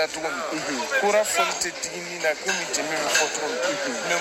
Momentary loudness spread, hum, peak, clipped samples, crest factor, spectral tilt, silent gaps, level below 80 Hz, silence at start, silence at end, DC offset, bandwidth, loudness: 7 LU; none; -6 dBFS; under 0.1%; 18 dB; -1 dB/octave; none; -64 dBFS; 0 s; 0 s; under 0.1%; 16.5 kHz; -24 LUFS